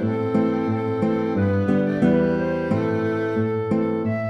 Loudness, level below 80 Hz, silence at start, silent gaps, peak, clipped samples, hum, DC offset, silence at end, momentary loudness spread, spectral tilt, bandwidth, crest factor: -22 LUFS; -52 dBFS; 0 s; none; -6 dBFS; under 0.1%; none; under 0.1%; 0 s; 4 LU; -9.5 dB/octave; 7.8 kHz; 16 dB